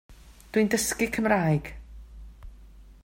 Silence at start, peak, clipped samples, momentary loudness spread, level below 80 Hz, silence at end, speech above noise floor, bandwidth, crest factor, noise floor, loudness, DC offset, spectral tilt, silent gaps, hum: 0.1 s; -8 dBFS; under 0.1%; 23 LU; -46 dBFS; 0.1 s; 24 dB; 16.5 kHz; 20 dB; -49 dBFS; -25 LUFS; under 0.1%; -5 dB/octave; none; none